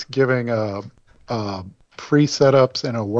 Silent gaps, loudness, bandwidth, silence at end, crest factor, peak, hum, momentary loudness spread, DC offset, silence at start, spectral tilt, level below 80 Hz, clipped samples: none; -19 LUFS; 8 kHz; 0 s; 16 dB; -4 dBFS; none; 18 LU; under 0.1%; 0 s; -6 dB/octave; -56 dBFS; under 0.1%